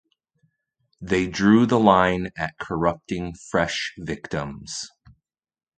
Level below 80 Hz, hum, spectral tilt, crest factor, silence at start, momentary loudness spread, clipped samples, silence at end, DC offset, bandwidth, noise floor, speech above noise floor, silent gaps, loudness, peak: -48 dBFS; none; -5.5 dB/octave; 24 dB; 1 s; 16 LU; under 0.1%; 0.9 s; under 0.1%; 9.2 kHz; -72 dBFS; 50 dB; none; -22 LUFS; 0 dBFS